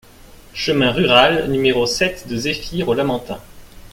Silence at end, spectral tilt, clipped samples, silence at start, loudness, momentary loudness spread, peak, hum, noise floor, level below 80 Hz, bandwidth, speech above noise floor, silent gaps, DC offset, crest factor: 0.1 s; -4.5 dB/octave; under 0.1%; 0.55 s; -17 LUFS; 13 LU; 0 dBFS; none; -43 dBFS; -40 dBFS; 16.5 kHz; 26 dB; none; under 0.1%; 18 dB